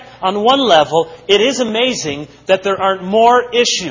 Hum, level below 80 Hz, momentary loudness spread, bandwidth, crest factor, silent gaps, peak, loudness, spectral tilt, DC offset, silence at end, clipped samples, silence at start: none; -52 dBFS; 8 LU; 8 kHz; 14 dB; none; 0 dBFS; -13 LUFS; -3 dB/octave; under 0.1%; 0 s; under 0.1%; 0 s